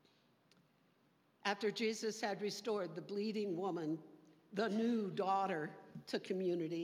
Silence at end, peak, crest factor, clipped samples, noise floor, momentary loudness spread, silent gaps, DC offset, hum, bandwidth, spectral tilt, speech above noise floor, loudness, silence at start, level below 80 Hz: 0 s; -20 dBFS; 20 dB; under 0.1%; -74 dBFS; 7 LU; none; under 0.1%; none; 15.5 kHz; -5 dB/octave; 35 dB; -40 LUFS; 1.45 s; under -90 dBFS